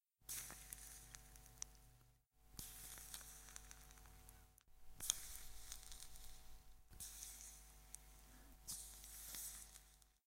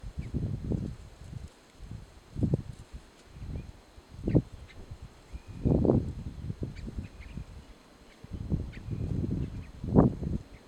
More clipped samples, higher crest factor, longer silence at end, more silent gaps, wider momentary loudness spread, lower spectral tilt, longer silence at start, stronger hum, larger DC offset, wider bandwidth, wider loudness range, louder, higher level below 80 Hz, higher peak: neither; first, 42 dB vs 26 dB; about the same, 0.1 s vs 0 s; neither; second, 15 LU vs 22 LU; second, -0.5 dB/octave vs -9.5 dB/octave; first, 0.2 s vs 0 s; neither; neither; first, 16.5 kHz vs 11 kHz; about the same, 6 LU vs 7 LU; second, -53 LUFS vs -32 LUFS; second, -64 dBFS vs -42 dBFS; second, -14 dBFS vs -6 dBFS